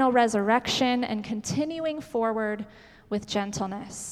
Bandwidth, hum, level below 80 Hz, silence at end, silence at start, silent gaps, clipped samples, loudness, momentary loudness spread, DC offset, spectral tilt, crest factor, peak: 14.5 kHz; none; -58 dBFS; 0 s; 0 s; none; under 0.1%; -27 LUFS; 11 LU; under 0.1%; -4 dB/octave; 18 dB; -8 dBFS